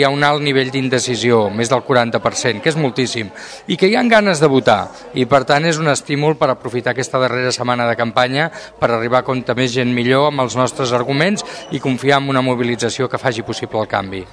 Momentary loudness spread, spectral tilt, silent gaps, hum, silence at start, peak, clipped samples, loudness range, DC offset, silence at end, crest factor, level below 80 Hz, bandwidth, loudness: 7 LU; -4.5 dB/octave; none; none; 0 s; 0 dBFS; 0.1%; 2 LU; under 0.1%; 0.05 s; 16 dB; -52 dBFS; 11 kHz; -16 LUFS